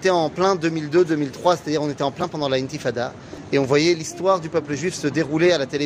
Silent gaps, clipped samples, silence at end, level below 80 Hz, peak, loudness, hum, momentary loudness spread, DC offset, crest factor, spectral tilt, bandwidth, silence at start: none; under 0.1%; 0 s; -56 dBFS; -4 dBFS; -21 LUFS; none; 7 LU; under 0.1%; 18 dB; -5 dB/octave; 12 kHz; 0 s